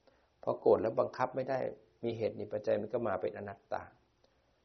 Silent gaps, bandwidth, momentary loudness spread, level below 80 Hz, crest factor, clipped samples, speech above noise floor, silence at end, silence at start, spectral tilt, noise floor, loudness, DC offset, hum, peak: none; 6.2 kHz; 13 LU; -74 dBFS; 20 dB; under 0.1%; 37 dB; 0.75 s; 0.45 s; -6 dB/octave; -72 dBFS; -35 LUFS; under 0.1%; none; -16 dBFS